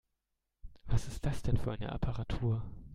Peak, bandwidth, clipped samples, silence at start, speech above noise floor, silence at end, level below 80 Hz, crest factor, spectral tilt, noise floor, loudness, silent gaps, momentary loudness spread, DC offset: -16 dBFS; 12.5 kHz; under 0.1%; 0.65 s; 52 dB; 0 s; -42 dBFS; 18 dB; -7 dB/octave; -85 dBFS; -37 LUFS; none; 4 LU; under 0.1%